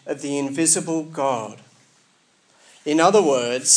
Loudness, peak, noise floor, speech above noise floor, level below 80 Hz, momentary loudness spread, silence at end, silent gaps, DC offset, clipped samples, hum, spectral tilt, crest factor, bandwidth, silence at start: -20 LUFS; -2 dBFS; -60 dBFS; 40 dB; -84 dBFS; 12 LU; 0 s; none; under 0.1%; under 0.1%; none; -2.5 dB/octave; 20 dB; 10.5 kHz; 0.05 s